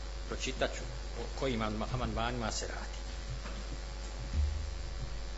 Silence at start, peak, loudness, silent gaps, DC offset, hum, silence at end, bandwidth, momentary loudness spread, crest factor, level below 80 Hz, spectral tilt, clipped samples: 0 s; -18 dBFS; -38 LUFS; none; under 0.1%; none; 0 s; 7.6 kHz; 8 LU; 20 dB; -40 dBFS; -4.5 dB/octave; under 0.1%